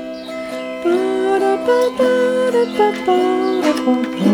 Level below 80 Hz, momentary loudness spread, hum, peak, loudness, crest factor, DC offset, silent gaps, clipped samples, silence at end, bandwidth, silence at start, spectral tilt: -56 dBFS; 10 LU; none; -2 dBFS; -16 LUFS; 14 dB; under 0.1%; none; under 0.1%; 0 s; 18 kHz; 0 s; -5.5 dB/octave